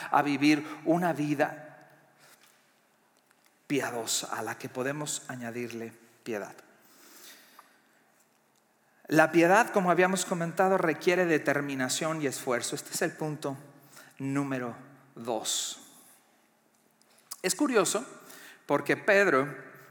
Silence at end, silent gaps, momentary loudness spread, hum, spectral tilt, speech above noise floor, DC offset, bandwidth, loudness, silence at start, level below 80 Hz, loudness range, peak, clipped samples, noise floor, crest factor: 0.1 s; none; 21 LU; none; -4 dB/octave; 40 dB; under 0.1%; 19 kHz; -28 LUFS; 0 s; -90 dBFS; 12 LU; -6 dBFS; under 0.1%; -68 dBFS; 24 dB